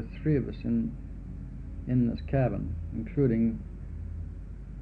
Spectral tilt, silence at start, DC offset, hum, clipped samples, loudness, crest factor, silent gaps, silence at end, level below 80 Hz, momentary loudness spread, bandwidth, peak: -11 dB/octave; 0 s; under 0.1%; none; under 0.1%; -30 LUFS; 16 dB; none; 0 s; -40 dBFS; 15 LU; 4.7 kHz; -14 dBFS